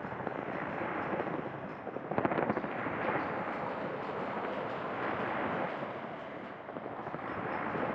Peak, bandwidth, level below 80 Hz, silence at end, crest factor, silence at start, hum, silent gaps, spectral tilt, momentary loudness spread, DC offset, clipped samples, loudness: -14 dBFS; 8 kHz; -68 dBFS; 0 s; 22 dB; 0 s; none; none; -8 dB/octave; 8 LU; under 0.1%; under 0.1%; -37 LUFS